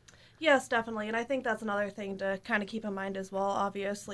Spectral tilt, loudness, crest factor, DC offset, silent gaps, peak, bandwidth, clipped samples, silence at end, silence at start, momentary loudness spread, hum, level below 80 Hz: -4.5 dB/octave; -32 LUFS; 20 dB; under 0.1%; none; -12 dBFS; 11 kHz; under 0.1%; 0 s; 0.4 s; 9 LU; none; -66 dBFS